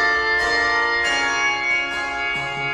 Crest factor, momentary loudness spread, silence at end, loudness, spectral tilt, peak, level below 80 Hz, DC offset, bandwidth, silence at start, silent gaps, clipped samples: 12 dB; 5 LU; 0 s; -19 LUFS; -1.5 dB/octave; -8 dBFS; -46 dBFS; under 0.1%; 12.5 kHz; 0 s; none; under 0.1%